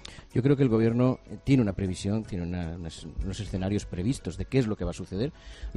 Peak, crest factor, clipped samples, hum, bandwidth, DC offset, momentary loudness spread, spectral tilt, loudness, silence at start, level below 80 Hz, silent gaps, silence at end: -10 dBFS; 18 dB; under 0.1%; none; 11.5 kHz; under 0.1%; 12 LU; -7.5 dB/octave; -28 LUFS; 0 s; -42 dBFS; none; 0 s